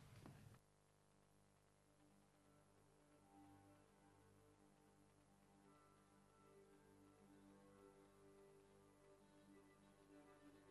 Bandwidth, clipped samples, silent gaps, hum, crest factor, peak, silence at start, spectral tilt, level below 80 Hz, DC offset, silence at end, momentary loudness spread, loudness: 12.5 kHz; under 0.1%; none; 50 Hz at -80 dBFS; 24 dB; -46 dBFS; 0 s; -5.5 dB/octave; -86 dBFS; under 0.1%; 0 s; 5 LU; -68 LUFS